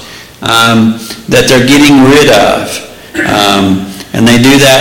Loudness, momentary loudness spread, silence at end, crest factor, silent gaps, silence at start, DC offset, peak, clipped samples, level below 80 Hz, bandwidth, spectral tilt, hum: -6 LUFS; 14 LU; 0 s; 6 dB; none; 0 s; under 0.1%; 0 dBFS; 0.6%; -34 dBFS; 17.5 kHz; -4 dB/octave; none